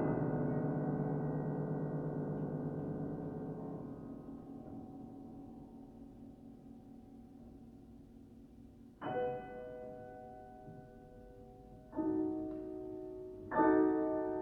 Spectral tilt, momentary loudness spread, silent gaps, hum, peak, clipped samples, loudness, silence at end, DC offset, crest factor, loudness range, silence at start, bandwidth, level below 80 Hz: -10.5 dB/octave; 21 LU; none; none; -18 dBFS; under 0.1%; -39 LUFS; 0 s; under 0.1%; 22 dB; 16 LU; 0 s; 3.8 kHz; -64 dBFS